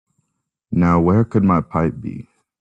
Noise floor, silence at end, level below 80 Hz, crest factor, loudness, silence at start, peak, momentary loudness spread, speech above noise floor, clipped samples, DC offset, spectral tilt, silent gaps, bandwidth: -75 dBFS; 0.4 s; -44 dBFS; 16 dB; -17 LUFS; 0.7 s; -4 dBFS; 16 LU; 59 dB; under 0.1%; under 0.1%; -10.5 dB/octave; none; 7.2 kHz